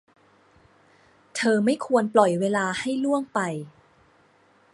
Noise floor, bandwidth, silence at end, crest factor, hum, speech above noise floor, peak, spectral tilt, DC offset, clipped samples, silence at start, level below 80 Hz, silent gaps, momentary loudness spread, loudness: -60 dBFS; 11.5 kHz; 1.05 s; 24 dB; none; 37 dB; -2 dBFS; -5 dB/octave; under 0.1%; under 0.1%; 1.35 s; -70 dBFS; none; 12 LU; -23 LUFS